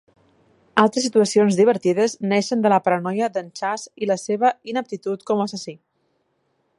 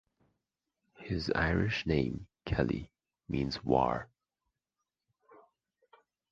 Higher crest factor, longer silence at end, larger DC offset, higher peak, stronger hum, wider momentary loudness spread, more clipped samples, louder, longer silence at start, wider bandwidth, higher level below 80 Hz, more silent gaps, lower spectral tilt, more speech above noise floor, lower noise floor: about the same, 20 dB vs 24 dB; second, 1.05 s vs 2.25 s; neither; first, 0 dBFS vs -12 dBFS; neither; second, 10 LU vs 13 LU; neither; first, -20 LUFS vs -33 LUFS; second, 0.75 s vs 1 s; first, 11.5 kHz vs 7.6 kHz; second, -70 dBFS vs -48 dBFS; neither; second, -5 dB/octave vs -7 dB/octave; second, 49 dB vs 57 dB; second, -69 dBFS vs -89 dBFS